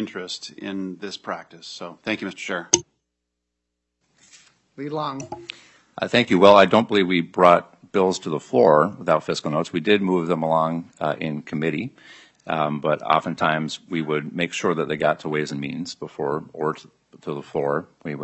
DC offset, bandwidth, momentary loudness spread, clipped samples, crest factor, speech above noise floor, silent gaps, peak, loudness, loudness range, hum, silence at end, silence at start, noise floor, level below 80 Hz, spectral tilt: under 0.1%; 8.6 kHz; 17 LU; under 0.1%; 22 dB; 57 dB; none; 0 dBFS; -22 LUFS; 10 LU; none; 0 s; 0 s; -79 dBFS; -64 dBFS; -4.5 dB/octave